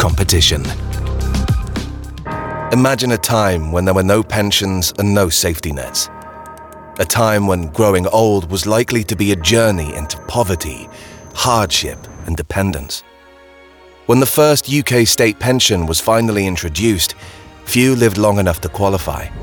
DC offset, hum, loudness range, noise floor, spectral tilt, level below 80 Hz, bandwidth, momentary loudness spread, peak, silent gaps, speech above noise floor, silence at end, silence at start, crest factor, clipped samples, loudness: under 0.1%; none; 4 LU; -43 dBFS; -4 dB/octave; -28 dBFS; 19 kHz; 14 LU; -2 dBFS; none; 28 dB; 0 s; 0 s; 14 dB; under 0.1%; -15 LUFS